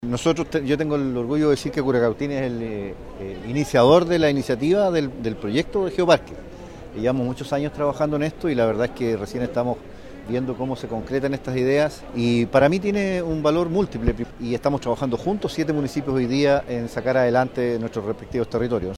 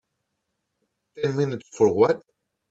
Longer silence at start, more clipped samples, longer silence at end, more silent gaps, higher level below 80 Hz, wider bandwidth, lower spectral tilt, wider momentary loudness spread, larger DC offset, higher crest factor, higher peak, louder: second, 0 s vs 1.15 s; neither; second, 0 s vs 0.5 s; neither; first, -42 dBFS vs -66 dBFS; first, 14 kHz vs 8 kHz; about the same, -6.5 dB/octave vs -7 dB/octave; about the same, 10 LU vs 10 LU; neither; about the same, 18 dB vs 20 dB; first, -2 dBFS vs -6 dBFS; about the same, -22 LUFS vs -23 LUFS